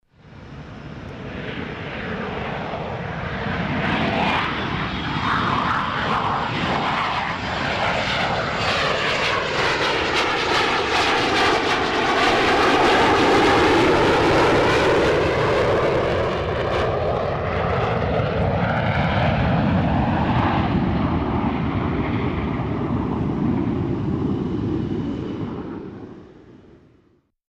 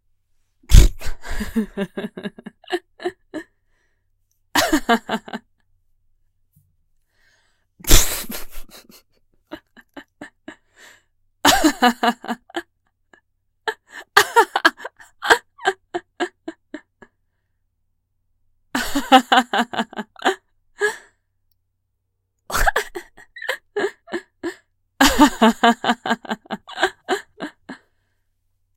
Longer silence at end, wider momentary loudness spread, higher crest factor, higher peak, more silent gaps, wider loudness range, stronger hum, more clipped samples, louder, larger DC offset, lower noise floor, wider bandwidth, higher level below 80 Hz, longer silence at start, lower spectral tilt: about the same, 0.95 s vs 1.05 s; second, 12 LU vs 23 LU; second, 16 dB vs 22 dB; second, -6 dBFS vs 0 dBFS; neither; about the same, 9 LU vs 8 LU; neither; neither; about the same, -20 LUFS vs -20 LUFS; neither; second, -60 dBFS vs -73 dBFS; second, 14 kHz vs 16.5 kHz; second, -36 dBFS vs -28 dBFS; second, 0.25 s vs 0.7 s; first, -5.5 dB/octave vs -3.5 dB/octave